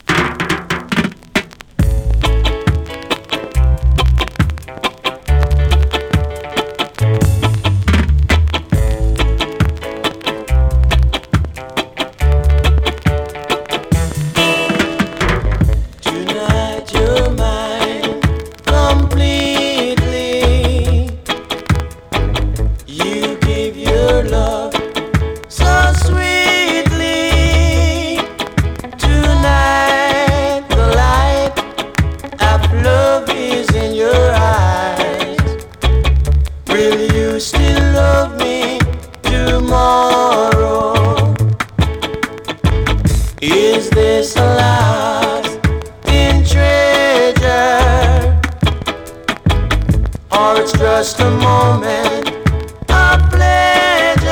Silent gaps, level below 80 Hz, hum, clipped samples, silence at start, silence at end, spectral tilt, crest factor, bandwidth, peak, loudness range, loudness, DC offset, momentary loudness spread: none; -18 dBFS; none; under 0.1%; 0.1 s; 0 s; -5.5 dB/octave; 10 dB; 17 kHz; -2 dBFS; 4 LU; -14 LUFS; under 0.1%; 8 LU